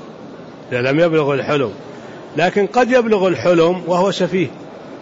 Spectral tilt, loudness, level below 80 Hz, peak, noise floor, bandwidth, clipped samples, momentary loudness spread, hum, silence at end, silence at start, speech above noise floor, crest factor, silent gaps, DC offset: -6 dB/octave; -16 LUFS; -56 dBFS; -4 dBFS; -35 dBFS; 8 kHz; under 0.1%; 21 LU; none; 0 s; 0 s; 19 dB; 12 dB; none; under 0.1%